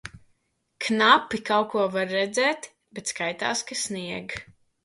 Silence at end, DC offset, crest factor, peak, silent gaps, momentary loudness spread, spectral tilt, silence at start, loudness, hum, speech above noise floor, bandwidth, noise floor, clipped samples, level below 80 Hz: 0.4 s; under 0.1%; 22 dB; -4 dBFS; none; 17 LU; -2.5 dB/octave; 0.05 s; -24 LUFS; none; 46 dB; 11.5 kHz; -71 dBFS; under 0.1%; -62 dBFS